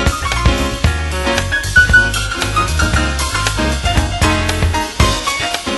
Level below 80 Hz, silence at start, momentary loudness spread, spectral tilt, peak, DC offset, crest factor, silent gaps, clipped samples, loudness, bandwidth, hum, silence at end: -20 dBFS; 0 s; 6 LU; -3.5 dB/octave; 0 dBFS; under 0.1%; 14 dB; none; under 0.1%; -14 LUFS; 12.5 kHz; none; 0 s